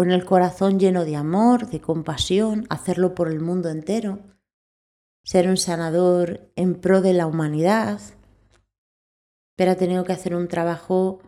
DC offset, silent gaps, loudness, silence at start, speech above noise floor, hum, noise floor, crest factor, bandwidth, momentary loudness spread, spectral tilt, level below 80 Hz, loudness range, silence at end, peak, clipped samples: under 0.1%; 4.53-5.24 s, 8.78-9.57 s; -21 LUFS; 0 s; 38 dB; none; -58 dBFS; 18 dB; 13 kHz; 8 LU; -6 dB/octave; -54 dBFS; 4 LU; 0.1 s; -4 dBFS; under 0.1%